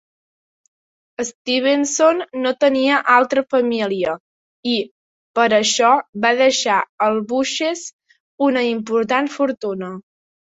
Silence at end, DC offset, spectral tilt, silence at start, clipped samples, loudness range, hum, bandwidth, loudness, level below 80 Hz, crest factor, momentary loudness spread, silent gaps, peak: 0.55 s; under 0.1%; -2.5 dB/octave; 1.2 s; under 0.1%; 3 LU; none; 8 kHz; -18 LUFS; -66 dBFS; 18 dB; 13 LU; 1.35-1.45 s, 4.20-4.63 s, 4.91-5.34 s, 6.09-6.13 s, 6.89-6.98 s, 7.93-7.99 s, 8.20-8.38 s, 9.57-9.61 s; -2 dBFS